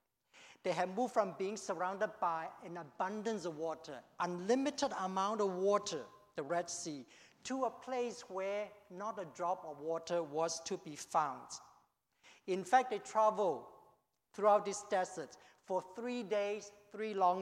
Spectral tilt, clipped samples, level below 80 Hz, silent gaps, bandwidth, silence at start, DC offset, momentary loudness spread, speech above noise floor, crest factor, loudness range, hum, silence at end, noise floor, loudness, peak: -4 dB/octave; under 0.1%; -84 dBFS; none; 14.5 kHz; 0.35 s; under 0.1%; 14 LU; 36 dB; 22 dB; 5 LU; none; 0 s; -74 dBFS; -38 LUFS; -18 dBFS